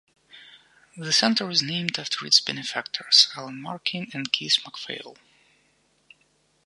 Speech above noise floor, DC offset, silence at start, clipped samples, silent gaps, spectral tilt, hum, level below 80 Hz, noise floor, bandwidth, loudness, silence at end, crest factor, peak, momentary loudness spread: 41 dB; under 0.1%; 0.35 s; under 0.1%; none; -2 dB/octave; none; -76 dBFS; -66 dBFS; 11.5 kHz; -22 LUFS; 1.55 s; 26 dB; 0 dBFS; 18 LU